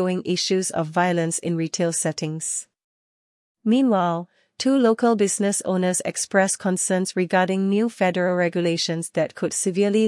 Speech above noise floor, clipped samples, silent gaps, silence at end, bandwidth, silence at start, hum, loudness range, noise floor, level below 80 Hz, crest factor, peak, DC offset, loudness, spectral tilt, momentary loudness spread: over 69 dB; under 0.1%; 2.84-3.55 s; 0 s; 12 kHz; 0 s; none; 4 LU; under -90 dBFS; -72 dBFS; 16 dB; -6 dBFS; under 0.1%; -22 LUFS; -4.5 dB/octave; 6 LU